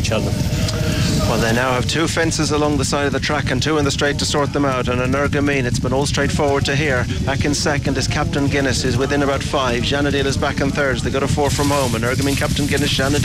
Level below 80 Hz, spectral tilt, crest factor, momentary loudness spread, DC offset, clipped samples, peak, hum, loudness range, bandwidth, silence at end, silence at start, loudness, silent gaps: -30 dBFS; -4.5 dB/octave; 10 dB; 2 LU; under 0.1%; under 0.1%; -8 dBFS; none; 1 LU; 16 kHz; 0 s; 0 s; -18 LUFS; none